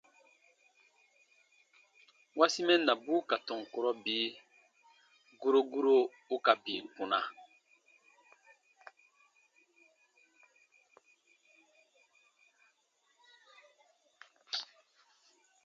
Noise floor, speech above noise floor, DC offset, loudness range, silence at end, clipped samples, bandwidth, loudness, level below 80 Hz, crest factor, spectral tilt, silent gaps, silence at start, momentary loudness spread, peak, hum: -75 dBFS; 44 dB; under 0.1%; 16 LU; 1 s; under 0.1%; 7.8 kHz; -32 LUFS; under -90 dBFS; 26 dB; -2.5 dB/octave; none; 2.35 s; 12 LU; -10 dBFS; none